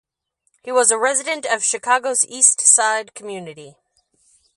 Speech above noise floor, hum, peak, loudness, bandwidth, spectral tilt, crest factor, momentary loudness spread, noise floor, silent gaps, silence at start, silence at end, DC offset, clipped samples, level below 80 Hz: 52 dB; none; 0 dBFS; -15 LUFS; 11.5 kHz; 0.5 dB/octave; 20 dB; 20 LU; -70 dBFS; none; 0.65 s; 0.9 s; under 0.1%; under 0.1%; -76 dBFS